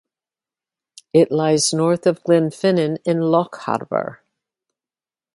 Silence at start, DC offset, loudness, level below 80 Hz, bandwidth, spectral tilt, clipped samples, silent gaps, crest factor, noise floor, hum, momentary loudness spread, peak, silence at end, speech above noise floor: 1.15 s; under 0.1%; -18 LUFS; -66 dBFS; 11.5 kHz; -5 dB/octave; under 0.1%; none; 18 dB; under -90 dBFS; none; 8 LU; -2 dBFS; 1.2 s; over 72 dB